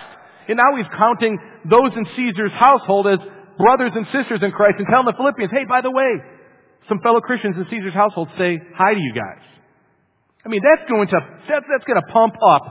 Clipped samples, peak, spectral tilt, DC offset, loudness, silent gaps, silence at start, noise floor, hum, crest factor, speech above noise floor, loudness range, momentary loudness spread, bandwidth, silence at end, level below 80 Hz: under 0.1%; 0 dBFS; -9.5 dB/octave; under 0.1%; -17 LUFS; none; 0 s; -62 dBFS; none; 18 dB; 46 dB; 4 LU; 9 LU; 4 kHz; 0 s; -60 dBFS